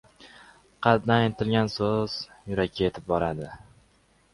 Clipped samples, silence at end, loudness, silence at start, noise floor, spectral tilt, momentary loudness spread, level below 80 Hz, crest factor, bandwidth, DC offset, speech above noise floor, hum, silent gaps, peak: under 0.1%; 0.75 s; -26 LUFS; 0.2 s; -63 dBFS; -7 dB/octave; 10 LU; -52 dBFS; 24 dB; 11.5 kHz; under 0.1%; 37 dB; none; none; -4 dBFS